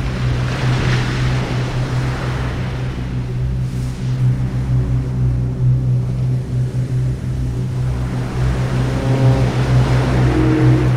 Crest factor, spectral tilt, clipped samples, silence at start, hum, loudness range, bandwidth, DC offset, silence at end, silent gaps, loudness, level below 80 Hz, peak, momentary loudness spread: 14 dB; -7.5 dB/octave; under 0.1%; 0 s; none; 4 LU; 10 kHz; under 0.1%; 0 s; none; -18 LUFS; -26 dBFS; -2 dBFS; 7 LU